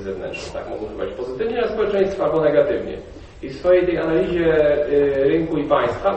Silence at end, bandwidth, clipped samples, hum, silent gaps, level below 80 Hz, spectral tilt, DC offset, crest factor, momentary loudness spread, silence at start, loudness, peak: 0 s; 8.4 kHz; under 0.1%; none; none; -42 dBFS; -7 dB/octave; under 0.1%; 16 dB; 13 LU; 0 s; -20 LUFS; -4 dBFS